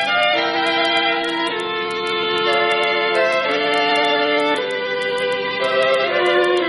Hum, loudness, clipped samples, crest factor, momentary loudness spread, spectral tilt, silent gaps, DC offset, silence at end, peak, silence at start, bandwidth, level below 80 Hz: none; -17 LUFS; under 0.1%; 14 dB; 5 LU; -3.5 dB/octave; none; under 0.1%; 0 s; -4 dBFS; 0 s; 11.5 kHz; -60 dBFS